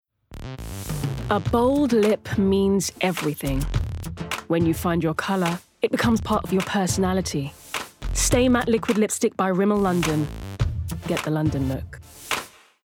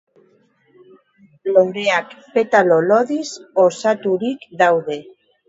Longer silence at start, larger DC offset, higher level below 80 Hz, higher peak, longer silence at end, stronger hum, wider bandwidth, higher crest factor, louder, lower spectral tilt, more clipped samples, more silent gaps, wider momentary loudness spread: second, 0.3 s vs 1.45 s; neither; first, -36 dBFS vs -70 dBFS; second, -6 dBFS vs 0 dBFS; about the same, 0.35 s vs 0.45 s; neither; first, 18.5 kHz vs 8 kHz; about the same, 16 dB vs 18 dB; second, -23 LUFS vs -17 LUFS; about the same, -5 dB/octave vs -5 dB/octave; neither; neither; about the same, 12 LU vs 11 LU